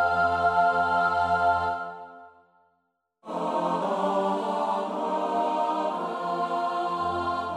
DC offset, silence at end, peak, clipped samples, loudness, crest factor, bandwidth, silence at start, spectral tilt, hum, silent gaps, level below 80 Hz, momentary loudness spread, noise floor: under 0.1%; 0 s; -12 dBFS; under 0.1%; -26 LUFS; 16 dB; 11 kHz; 0 s; -6 dB/octave; none; none; -60 dBFS; 8 LU; -75 dBFS